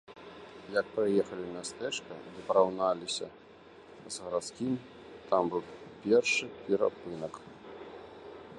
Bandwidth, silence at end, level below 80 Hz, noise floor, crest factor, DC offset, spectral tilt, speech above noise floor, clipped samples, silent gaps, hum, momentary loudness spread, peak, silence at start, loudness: 11.5 kHz; 0 s; -70 dBFS; -53 dBFS; 22 dB; under 0.1%; -4 dB/octave; 22 dB; under 0.1%; none; none; 21 LU; -12 dBFS; 0.1 s; -32 LUFS